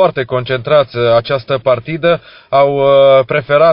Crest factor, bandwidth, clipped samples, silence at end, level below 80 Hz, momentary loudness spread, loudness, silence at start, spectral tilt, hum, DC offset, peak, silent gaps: 12 dB; 5.6 kHz; under 0.1%; 0 s; -46 dBFS; 8 LU; -12 LUFS; 0 s; -4 dB/octave; none; under 0.1%; 0 dBFS; none